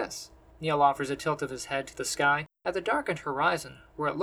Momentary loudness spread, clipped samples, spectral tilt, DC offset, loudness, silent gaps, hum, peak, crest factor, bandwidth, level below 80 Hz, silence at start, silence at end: 11 LU; under 0.1%; -4 dB/octave; under 0.1%; -29 LUFS; none; none; -10 dBFS; 18 dB; 18.5 kHz; -60 dBFS; 0 s; 0 s